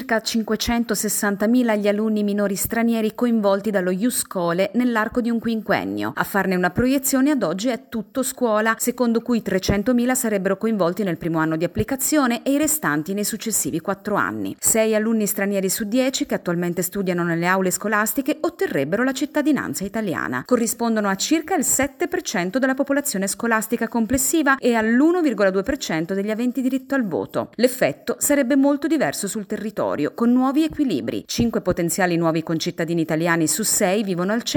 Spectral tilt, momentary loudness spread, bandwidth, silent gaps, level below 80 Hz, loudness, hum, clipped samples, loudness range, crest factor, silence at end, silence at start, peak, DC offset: -4 dB/octave; 6 LU; 17.5 kHz; none; -48 dBFS; -21 LUFS; none; under 0.1%; 2 LU; 18 dB; 0 s; 0 s; -4 dBFS; under 0.1%